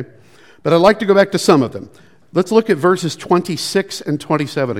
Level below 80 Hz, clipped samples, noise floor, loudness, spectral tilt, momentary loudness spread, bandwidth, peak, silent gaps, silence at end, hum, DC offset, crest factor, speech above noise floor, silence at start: -54 dBFS; under 0.1%; -47 dBFS; -15 LUFS; -5.5 dB/octave; 11 LU; 16 kHz; 0 dBFS; none; 0 s; none; 0.4%; 16 dB; 32 dB; 0 s